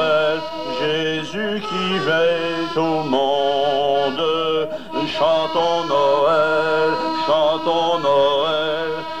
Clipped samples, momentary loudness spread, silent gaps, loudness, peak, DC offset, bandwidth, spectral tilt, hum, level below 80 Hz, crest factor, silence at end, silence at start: under 0.1%; 7 LU; none; -19 LUFS; -6 dBFS; 1%; 10.5 kHz; -5 dB/octave; none; -56 dBFS; 12 dB; 0 s; 0 s